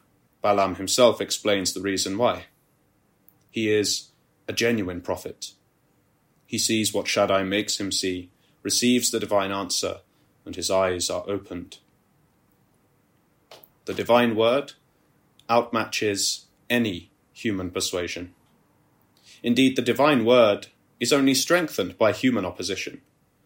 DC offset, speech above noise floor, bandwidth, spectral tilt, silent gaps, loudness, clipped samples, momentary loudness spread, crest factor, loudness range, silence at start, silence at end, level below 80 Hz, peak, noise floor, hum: under 0.1%; 42 dB; 16.5 kHz; -3 dB/octave; none; -23 LUFS; under 0.1%; 15 LU; 20 dB; 7 LU; 0.45 s; 0.5 s; -64 dBFS; -4 dBFS; -65 dBFS; none